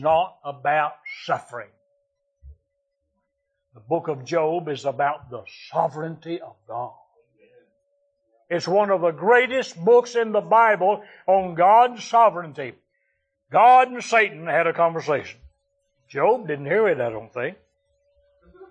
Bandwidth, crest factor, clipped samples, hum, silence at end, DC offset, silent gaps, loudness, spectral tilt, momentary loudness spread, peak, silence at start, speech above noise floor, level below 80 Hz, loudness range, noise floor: 9.2 kHz; 18 dB; under 0.1%; none; 0.05 s; under 0.1%; none; -21 LUFS; -5 dB/octave; 17 LU; -4 dBFS; 0 s; 56 dB; -62 dBFS; 12 LU; -77 dBFS